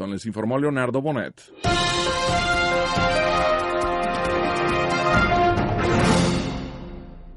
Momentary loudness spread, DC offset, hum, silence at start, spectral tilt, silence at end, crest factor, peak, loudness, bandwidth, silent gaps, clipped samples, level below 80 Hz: 10 LU; under 0.1%; none; 0 s; -5 dB/octave; 0 s; 14 dB; -8 dBFS; -21 LUFS; 11.5 kHz; none; under 0.1%; -36 dBFS